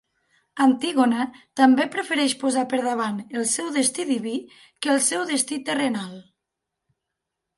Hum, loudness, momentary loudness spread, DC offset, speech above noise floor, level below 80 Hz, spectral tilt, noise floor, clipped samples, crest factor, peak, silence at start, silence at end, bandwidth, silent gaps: none; -22 LUFS; 10 LU; under 0.1%; 60 dB; -74 dBFS; -2.5 dB/octave; -83 dBFS; under 0.1%; 20 dB; -4 dBFS; 0.55 s; 1.35 s; 11.5 kHz; none